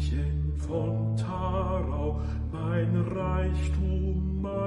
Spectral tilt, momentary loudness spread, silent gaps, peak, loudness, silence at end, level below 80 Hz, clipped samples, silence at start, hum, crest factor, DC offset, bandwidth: -8.5 dB/octave; 3 LU; none; -16 dBFS; -29 LUFS; 0 s; -34 dBFS; under 0.1%; 0 s; none; 12 dB; under 0.1%; 10 kHz